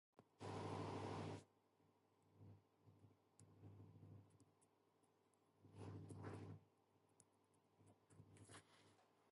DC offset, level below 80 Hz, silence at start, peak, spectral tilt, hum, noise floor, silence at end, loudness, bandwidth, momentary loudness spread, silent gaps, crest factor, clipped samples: under 0.1%; -80 dBFS; 0.15 s; -38 dBFS; -6.5 dB/octave; none; -81 dBFS; 0 s; -56 LUFS; 11.5 kHz; 18 LU; none; 20 dB; under 0.1%